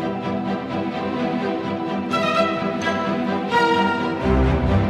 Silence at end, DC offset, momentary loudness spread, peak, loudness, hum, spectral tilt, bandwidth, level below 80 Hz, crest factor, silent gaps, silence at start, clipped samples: 0 s; under 0.1%; 7 LU; -6 dBFS; -21 LUFS; none; -6.5 dB/octave; 12 kHz; -32 dBFS; 14 dB; none; 0 s; under 0.1%